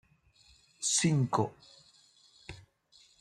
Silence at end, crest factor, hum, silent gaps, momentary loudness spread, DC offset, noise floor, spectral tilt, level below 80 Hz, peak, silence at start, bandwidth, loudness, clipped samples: 0.6 s; 22 dB; none; none; 23 LU; under 0.1%; -64 dBFS; -4 dB/octave; -68 dBFS; -14 dBFS; 0.8 s; 12.5 kHz; -30 LUFS; under 0.1%